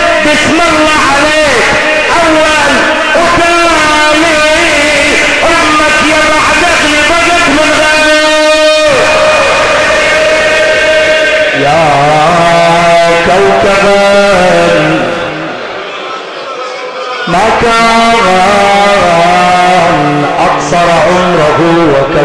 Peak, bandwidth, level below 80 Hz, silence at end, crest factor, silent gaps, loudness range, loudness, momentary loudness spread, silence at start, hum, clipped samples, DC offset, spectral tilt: 0 dBFS; 11 kHz; -30 dBFS; 0 s; 6 dB; none; 3 LU; -6 LUFS; 4 LU; 0 s; none; under 0.1%; under 0.1%; -3.5 dB/octave